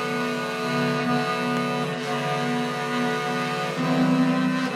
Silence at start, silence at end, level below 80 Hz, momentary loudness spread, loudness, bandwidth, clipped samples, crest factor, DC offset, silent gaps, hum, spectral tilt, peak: 0 s; 0 s; -68 dBFS; 5 LU; -24 LUFS; 14.5 kHz; under 0.1%; 12 dB; under 0.1%; none; none; -5.5 dB/octave; -12 dBFS